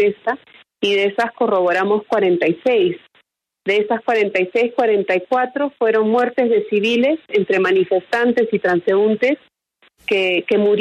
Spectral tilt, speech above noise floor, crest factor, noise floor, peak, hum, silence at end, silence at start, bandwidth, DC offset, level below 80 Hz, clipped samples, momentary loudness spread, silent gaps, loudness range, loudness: -6 dB/octave; 43 dB; 12 dB; -60 dBFS; -6 dBFS; none; 0 s; 0 s; 9.2 kHz; under 0.1%; -68 dBFS; under 0.1%; 5 LU; none; 2 LU; -17 LUFS